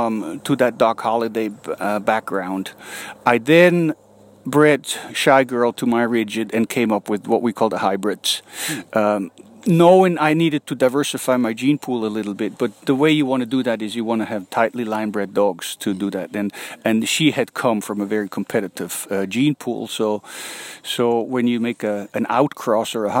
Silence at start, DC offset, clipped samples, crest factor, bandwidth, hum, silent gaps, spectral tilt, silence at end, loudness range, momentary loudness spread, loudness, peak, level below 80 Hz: 0 s; under 0.1%; under 0.1%; 18 dB; 16.5 kHz; none; none; -5 dB/octave; 0 s; 5 LU; 11 LU; -19 LUFS; -2 dBFS; -68 dBFS